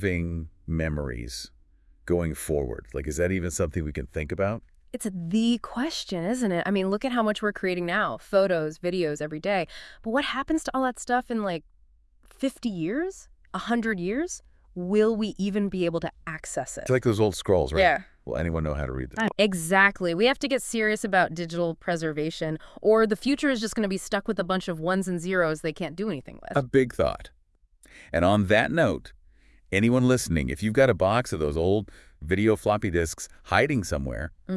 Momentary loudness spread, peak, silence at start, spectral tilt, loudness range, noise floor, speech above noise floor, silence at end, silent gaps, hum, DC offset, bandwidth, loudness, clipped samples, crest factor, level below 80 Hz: 11 LU; -4 dBFS; 0 s; -5.5 dB/octave; 6 LU; -62 dBFS; 36 dB; 0 s; none; none; under 0.1%; 12 kHz; -26 LUFS; under 0.1%; 22 dB; -46 dBFS